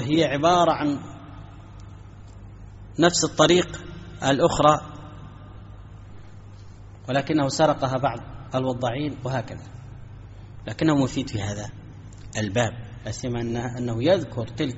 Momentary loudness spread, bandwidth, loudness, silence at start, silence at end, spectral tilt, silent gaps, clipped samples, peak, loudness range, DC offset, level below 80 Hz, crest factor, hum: 25 LU; 8 kHz; -23 LUFS; 0 s; 0 s; -4.5 dB/octave; none; under 0.1%; -2 dBFS; 6 LU; under 0.1%; -46 dBFS; 22 dB; none